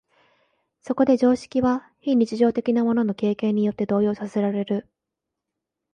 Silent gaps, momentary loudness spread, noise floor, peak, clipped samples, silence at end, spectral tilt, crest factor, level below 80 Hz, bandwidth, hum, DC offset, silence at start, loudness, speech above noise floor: none; 7 LU; -84 dBFS; -8 dBFS; under 0.1%; 1.1 s; -7.5 dB/octave; 16 dB; -60 dBFS; 9.4 kHz; none; under 0.1%; 0.85 s; -22 LUFS; 63 dB